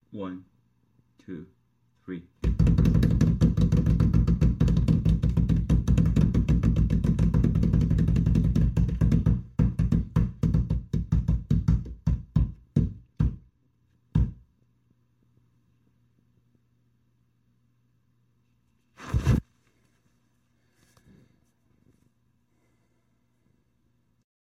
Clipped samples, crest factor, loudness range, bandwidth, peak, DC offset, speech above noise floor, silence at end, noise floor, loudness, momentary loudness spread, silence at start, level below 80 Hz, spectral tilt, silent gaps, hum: under 0.1%; 18 dB; 11 LU; 7.6 kHz; -10 dBFS; under 0.1%; 37 dB; 5.05 s; -71 dBFS; -25 LUFS; 11 LU; 0.15 s; -32 dBFS; -9 dB/octave; none; none